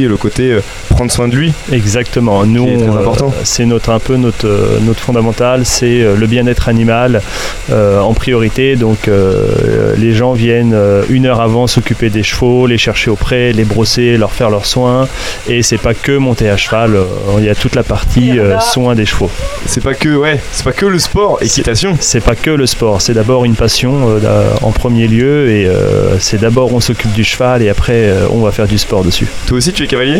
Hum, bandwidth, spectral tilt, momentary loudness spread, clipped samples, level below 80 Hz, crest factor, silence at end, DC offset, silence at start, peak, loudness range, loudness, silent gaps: none; 16 kHz; -5 dB/octave; 3 LU; under 0.1%; -22 dBFS; 10 dB; 0 s; under 0.1%; 0 s; 0 dBFS; 1 LU; -10 LUFS; none